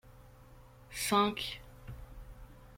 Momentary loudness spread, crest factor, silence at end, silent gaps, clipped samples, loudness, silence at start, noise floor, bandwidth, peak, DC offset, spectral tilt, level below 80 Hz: 25 LU; 22 dB; 0 s; none; under 0.1%; -33 LUFS; 0.05 s; -56 dBFS; 16.5 kHz; -16 dBFS; under 0.1%; -3.5 dB/octave; -54 dBFS